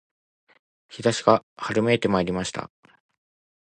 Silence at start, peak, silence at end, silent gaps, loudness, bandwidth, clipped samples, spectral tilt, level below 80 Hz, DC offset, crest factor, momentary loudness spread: 0.9 s; -2 dBFS; 1 s; 1.43-1.56 s; -23 LUFS; 10 kHz; under 0.1%; -5 dB/octave; -56 dBFS; under 0.1%; 24 dB; 15 LU